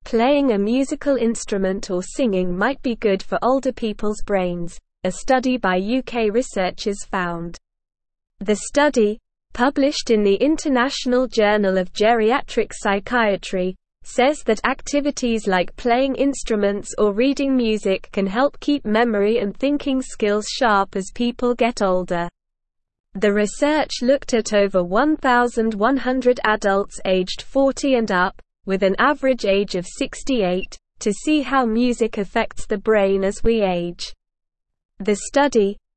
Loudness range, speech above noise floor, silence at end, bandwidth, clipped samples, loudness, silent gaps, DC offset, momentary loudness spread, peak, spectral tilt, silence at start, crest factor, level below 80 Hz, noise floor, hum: 3 LU; 57 dB; 0.2 s; 8.8 kHz; under 0.1%; -20 LUFS; 23.00-23.04 s, 34.85-34.89 s; 0.4%; 8 LU; -2 dBFS; -4.5 dB/octave; 0.05 s; 18 dB; -40 dBFS; -77 dBFS; none